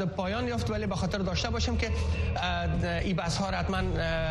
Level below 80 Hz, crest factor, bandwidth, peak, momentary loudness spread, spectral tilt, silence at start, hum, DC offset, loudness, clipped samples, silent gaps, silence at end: -36 dBFS; 12 dB; 11.5 kHz; -16 dBFS; 1 LU; -5.5 dB/octave; 0 s; none; under 0.1%; -30 LUFS; under 0.1%; none; 0 s